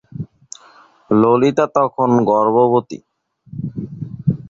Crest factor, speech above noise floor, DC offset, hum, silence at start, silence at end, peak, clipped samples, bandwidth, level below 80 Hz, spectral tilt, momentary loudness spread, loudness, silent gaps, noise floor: 14 dB; 34 dB; under 0.1%; none; 0.2 s; 0.1 s; -2 dBFS; under 0.1%; 7.6 kHz; -52 dBFS; -8 dB/octave; 21 LU; -15 LUFS; none; -48 dBFS